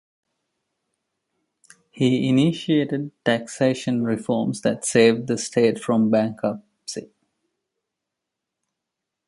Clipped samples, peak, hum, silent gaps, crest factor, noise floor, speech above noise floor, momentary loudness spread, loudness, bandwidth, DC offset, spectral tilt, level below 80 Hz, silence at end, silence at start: under 0.1%; -4 dBFS; none; none; 20 dB; -83 dBFS; 63 dB; 10 LU; -21 LUFS; 11.5 kHz; under 0.1%; -5.5 dB/octave; -66 dBFS; 2.25 s; 1.95 s